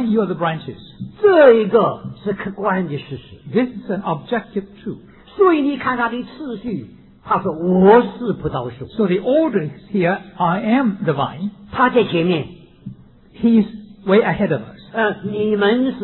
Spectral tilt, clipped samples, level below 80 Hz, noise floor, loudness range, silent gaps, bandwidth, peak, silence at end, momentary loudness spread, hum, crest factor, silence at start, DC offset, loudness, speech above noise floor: -11 dB/octave; under 0.1%; -50 dBFS; -38 dBFS; 4 LU; none; 4.2 kHz; 0 dBFS; 0 s; 17 LU; none; 18 dB; 0 s; under 0.1%; -18 LUFS; 21 dB